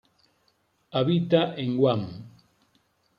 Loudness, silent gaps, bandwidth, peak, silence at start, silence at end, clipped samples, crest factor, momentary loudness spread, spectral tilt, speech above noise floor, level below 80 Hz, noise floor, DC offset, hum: -25 LUFS; none; 5.6 kHz; -6 dBFS; 0.95 s; 0.9 s; under 0.1%; 20 dB; 13 LU; -9 dB/octave; 45 dB; -68 dBFS; -69 dBFS; under 0.1%; none